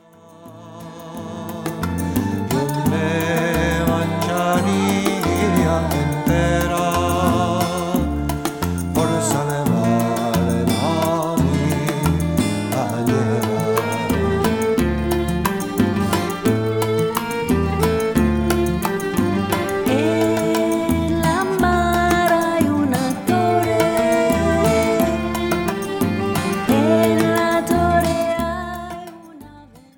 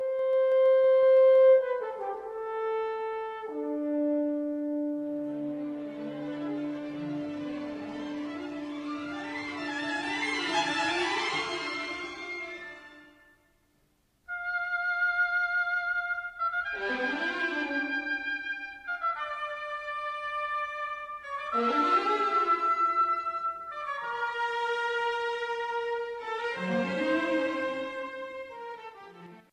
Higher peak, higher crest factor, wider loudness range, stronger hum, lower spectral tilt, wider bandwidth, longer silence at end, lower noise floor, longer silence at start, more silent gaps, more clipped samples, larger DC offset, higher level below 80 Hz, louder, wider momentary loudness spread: first, 0 dBFS vs -12 dBFS; about the same, 18 dB vs 16 dB; second, 2 LU vs 8 LU; neither; first, -6 dB/octave vs -4 dB/octave; first, 18 kHz vs 10 kHz; about the same, 0.2 s vs 0.1 s; second, -44 dBFS vs -70 dBFS; first, 0.4 s vs 0 s; neither; neither; neither; first, -34 dBFS vs -70 dBFS; first, -19 LUFS vs -29 LUFS; second, 6 LU vs 12 LU